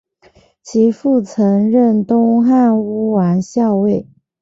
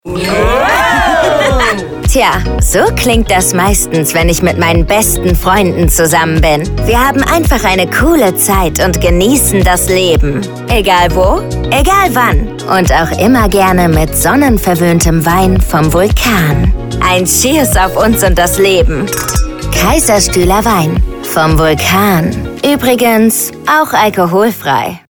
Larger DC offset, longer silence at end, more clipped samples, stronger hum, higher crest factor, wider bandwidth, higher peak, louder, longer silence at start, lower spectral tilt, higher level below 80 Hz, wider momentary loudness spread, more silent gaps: second, under 0.1% vs 0.3%; first, 0.4 s vs 0.1 s; neither; neither; about the same, 12 dB vs 10 dB; second, 7.8 kHz vs over 20 kHz; about the same, -2 dBFS vs 0 dBFS; second, -14 LUFS vs -9 LUFS; first, 0.65 s vs 0.05 s; first, -8.5 dB/octave vs -4.5 dB/octave; second, -56 dBFS vs -18 dBFS; about the same, 5 LU vs 5 LU; neither